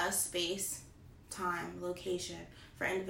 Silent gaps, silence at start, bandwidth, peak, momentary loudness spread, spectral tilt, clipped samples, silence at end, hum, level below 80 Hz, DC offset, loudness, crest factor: none; 0 s; 16 kHz; -20 dBFS; 15 LU; -2.5 dB/octave; under 0.1%; 0 s; none; -62 dBFS; under 0.1%; -38 LUFS; 18 dB